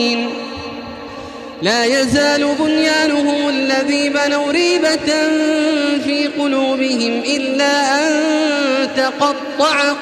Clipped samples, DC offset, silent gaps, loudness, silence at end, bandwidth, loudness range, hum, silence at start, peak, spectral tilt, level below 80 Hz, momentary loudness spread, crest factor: under 0.1%; under 0.1%; none; -15 LUFS; 0 s; 13.5 kHz; 1 LU; none; 0 s; -2 dBFS; -3 dB/octave; -52 dBFS; 10 LU; 12 dB